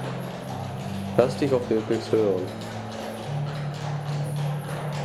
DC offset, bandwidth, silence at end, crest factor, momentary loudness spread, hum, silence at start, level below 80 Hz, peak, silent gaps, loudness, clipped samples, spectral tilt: under 0.1%; 13 kHz; 0 s; 22 dB; 10 LU; none; 0 s; -58 dBFS; -6 dBFS; none; -27 LUFS; under 0.1%; -7 dB/octave